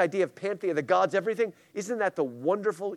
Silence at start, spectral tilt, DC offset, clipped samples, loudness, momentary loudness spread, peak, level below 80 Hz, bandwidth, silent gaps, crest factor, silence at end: 0 s; -5.5 dB/octave; under 0.1%; under 0.1%; -28 LUFS; 7 LU; -10 dBFS; -82 dBFS; 13.5 kHz; none; 18 dB; 0 s